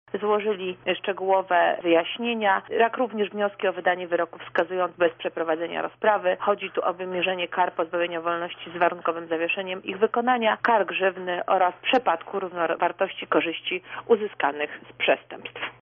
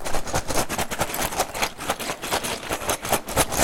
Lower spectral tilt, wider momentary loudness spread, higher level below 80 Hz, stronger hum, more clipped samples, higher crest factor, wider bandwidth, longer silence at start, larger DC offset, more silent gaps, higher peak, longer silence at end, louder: second, 1 dB/octave vs -2.5 dB/octave; first, 7 LU vs 4 LU; second, -72 dBFS vs -38 dBFS; neither; neither; about the same, 16 dB vs 20 dB; second, 3.9 kHz vs 17 kHz; first, 0.15 s vs 0 s; neither; neither; second, -8 dBFS vs -4 dBFS; about the same, 0.1 s vs 0 s; about the same, -25 LUFS vs -25 LUFS